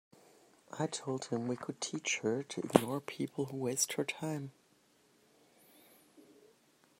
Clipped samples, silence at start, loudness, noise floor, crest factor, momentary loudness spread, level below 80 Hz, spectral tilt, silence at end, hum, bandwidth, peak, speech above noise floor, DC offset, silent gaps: under 0.1%; 0.7 s; -36 LUFS; -69 dBFS; 34 dB; 9 LU; -76 dBFS; -4 dB/octave; 0.75 s; none; 16 kHz; -4 dBFS; 33 dB; under 0.1%; none